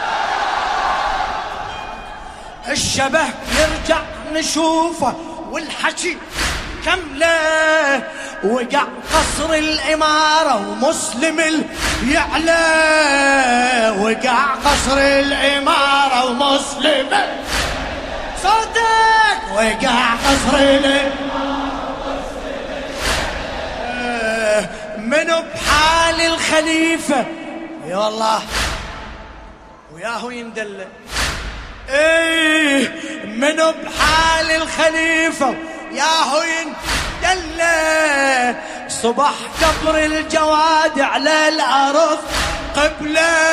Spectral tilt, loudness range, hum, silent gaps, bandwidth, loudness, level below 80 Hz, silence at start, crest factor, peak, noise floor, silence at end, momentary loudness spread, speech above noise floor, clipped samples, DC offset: -2.5 dB/octave; 6 LU; none; none; 15.5 kHz; -16 LUFS; -34 dBFS; 0 s; 16 dB; 0 dBFS; -39 dBFS; 0 s; 13 LU; 23 dB; under 0.1%; under 0.1%